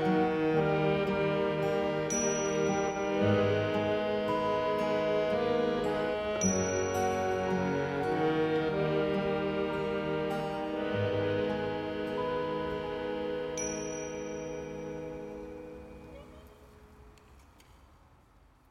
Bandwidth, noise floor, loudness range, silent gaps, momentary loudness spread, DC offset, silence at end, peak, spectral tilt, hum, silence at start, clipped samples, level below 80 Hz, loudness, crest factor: 15.5 kHz; -61 dBFS; 12 LU; none; 11 LU; under 0.1%; 1.3 s; -16 dBFS; -5 dB/octave; none; 0 s; under 0.1%; -56 dBFS; -31 LUFS; 16 dB